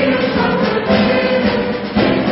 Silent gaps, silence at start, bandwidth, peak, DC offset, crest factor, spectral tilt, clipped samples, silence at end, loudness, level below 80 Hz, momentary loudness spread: none; 0 s; 5.8 kHz; 0 dBFS; under 0.1%; 14 dB; -10.5 dB/octave; under 0.1%; 0 s; -15 LUFS; -38 dBFS; 3 LU